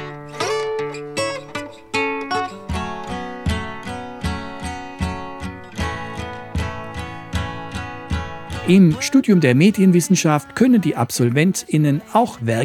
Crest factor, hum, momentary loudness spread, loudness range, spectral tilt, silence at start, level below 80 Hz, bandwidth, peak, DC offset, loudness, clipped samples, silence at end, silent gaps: 18 dB; none; 16 LU; 12 LU; -5.5 dB/octave; 0 s; -40 dBFS; 17 kHz; 0 dBFS; under 0.1%; -20 LUFS; under 0.1%; 0 s; none